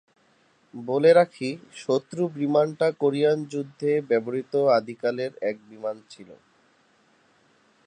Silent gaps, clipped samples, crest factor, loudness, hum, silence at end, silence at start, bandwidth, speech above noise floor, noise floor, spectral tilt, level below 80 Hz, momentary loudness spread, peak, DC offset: none; under 0.1%; 20 dB; -24 LUFS; none; 1.55 s; 0.75 s; 9.8 kHz; 39 dB; -63 dBFS; -6.5 dB/octave; -78 dBFS; 14 LU; -6 dBFS; under 0.1%